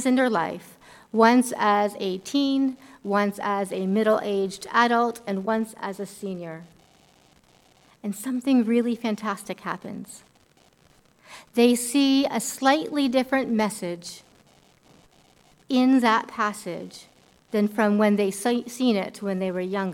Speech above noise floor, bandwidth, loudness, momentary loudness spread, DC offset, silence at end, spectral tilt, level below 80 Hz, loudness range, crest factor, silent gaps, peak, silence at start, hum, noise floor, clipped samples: 36 dB; 17 kHz; -24 LUFS; 14 LU; under 0.1%; 0 s; -4.5 dB/octave; -68 dBFS; 5 LU; 22 dB; none; -4 dBFS; 0 s; none; -59 dBFS; under 0.1%